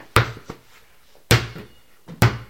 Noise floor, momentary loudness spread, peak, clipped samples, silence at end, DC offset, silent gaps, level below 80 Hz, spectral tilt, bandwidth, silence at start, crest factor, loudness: -55 dBFS; 22 LU; 0 dBFS; under 0.1%; 0.05 s; 0.3%; none; -38 dBFS; -4.5 dB/octave; 17 kHz; 0.15 s; 24 dB; -21 LUFS